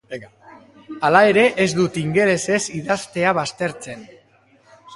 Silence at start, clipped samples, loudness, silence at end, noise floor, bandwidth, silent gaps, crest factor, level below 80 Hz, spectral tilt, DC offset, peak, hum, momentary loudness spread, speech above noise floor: 0.1 s; under 0.1%; -18 LUFS; 0 s; -55 dBFS; 11.5 kHz; none; 20 dB; -58 dBFS; -4.5 dB/octave; under 0.1%; 0 dBFS; none; 21 LU; 36 dB